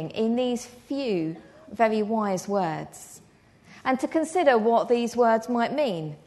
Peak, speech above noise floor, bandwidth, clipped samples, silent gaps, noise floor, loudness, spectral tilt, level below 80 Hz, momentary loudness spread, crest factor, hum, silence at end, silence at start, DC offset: -8 dBFS; 29 dB; 12 kHz; under 0.1%; none; -54 dBFS; -25 LUFS; -5.5 dB/octave; -66 dBFS; 13 LU; 18 dB; none; 0.1 s; 0 s; under 0.1%